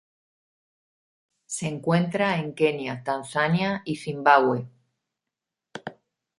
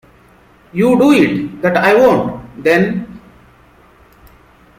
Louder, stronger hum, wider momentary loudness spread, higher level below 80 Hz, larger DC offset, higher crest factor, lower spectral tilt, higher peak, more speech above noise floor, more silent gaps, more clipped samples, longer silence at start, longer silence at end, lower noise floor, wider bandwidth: second, -24 LUFS vs -13 LUFS; neither; first, 20 LU vs 14 LU; second, -68 dBFS vs -48 dBFS; neither; first, 24 dB vs 14 dB; about the same, -5.5 dB/octave vs -6.5 dB/octave; about the same, -2 dBFS vs 0 dBFS; first, 63 dB vs 35 dB; neither; neither; first, 1.5 s vs 0.75 s; second, 0.45 s vs 1.6 s; first, -87 dBFS vs -46 dBFS; second, 11.5 kHz vs 16 kHz